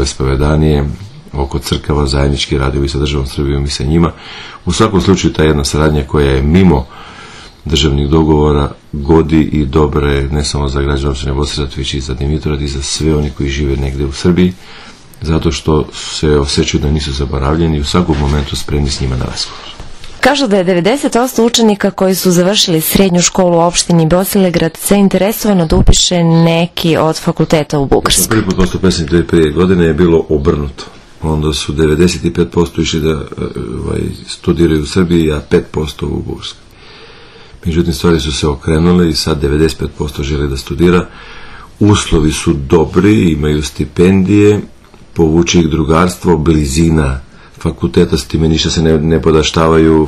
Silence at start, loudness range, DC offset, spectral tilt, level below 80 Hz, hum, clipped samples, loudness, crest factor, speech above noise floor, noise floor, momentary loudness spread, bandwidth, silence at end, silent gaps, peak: 0 s; 5 LU; under 0.1%; -5.5 dB/octave; -22 dBFS; none; 0.4%; -12 LUFS; 12 dB; 24 dB; -35 dBFS; 10 LU; 14.5 kHz; 0 s; none; 0 dBFS